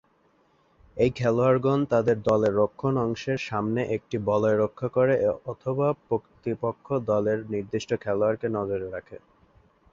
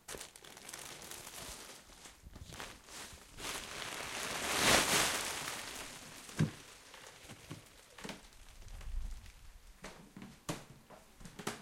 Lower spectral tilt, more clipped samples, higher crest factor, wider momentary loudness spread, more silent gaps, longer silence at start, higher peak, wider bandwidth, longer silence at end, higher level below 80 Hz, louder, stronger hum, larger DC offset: first, -7.5 dB/octave vs -2 dB/octave; neither; second, 18 dB vs 30 dB; second, 8 LU vs 24 LU; neither; first, 0.95 s vs 0.1 s; first, -8 dBFS vs -12 dBFS; second, 7.6 kHz vs 16.5 kHz; first, 0.75 s vs 0 s; about the same, -56 dBFS vs -54 dBFS; first, -26 LUFS vs -37 LUFS; neither; neither